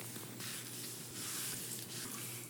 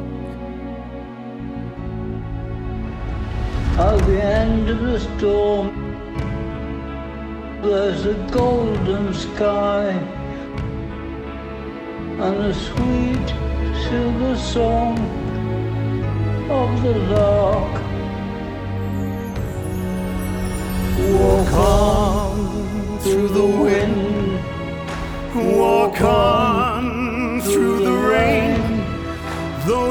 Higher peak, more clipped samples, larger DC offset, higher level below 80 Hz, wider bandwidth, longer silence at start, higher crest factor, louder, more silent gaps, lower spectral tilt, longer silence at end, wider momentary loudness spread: second, -28 dBFS vs -2 dBFS; neither; neither; second, -80 dBFS vs -28 dBFS; about the same, over 20 kHz vs over 20 kHz; about the same, 0 s vs 0 s; about the same, 18 dB vs 18 dB; second, -42 LUFS vs -20 LUFS; neither; second, -2 dB/octave vs -6.5 dB/octave; about the same, 0 s vs 0 s; second, 5 LU vs 14 LU